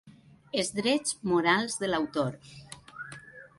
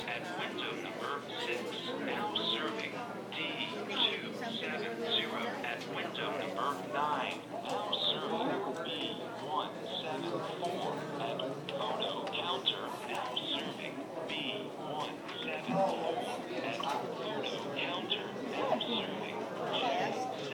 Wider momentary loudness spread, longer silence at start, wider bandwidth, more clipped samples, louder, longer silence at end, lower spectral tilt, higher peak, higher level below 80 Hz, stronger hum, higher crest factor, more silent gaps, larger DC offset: first, 21 LU vs 7 LU; about the same, 0.05 s vs 0 s; second, 11.5 kHz vs 19 kHz; neither; first, -28 LUFS vs -36 LUFS; first, 0.15 s vs 0 s; about the same, -3.5 dB/octave vs -4 dB/octave; first, -10 dBFS vs -18 dBFS; first, -64 dBFS vs -78 dBFS; neither; about the same, 20 dB vs 20 dB; neither; neither